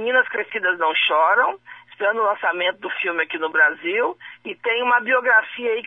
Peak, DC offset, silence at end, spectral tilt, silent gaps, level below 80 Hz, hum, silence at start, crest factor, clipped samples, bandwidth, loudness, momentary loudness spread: -4 dBFS; under 0.1%; 0.05 s; -4 dB/octave; none; -76 dBFS; none; 0 s; 16 dB; under 0.1%; 3.9 kHz; -19 LUFS; 8 LU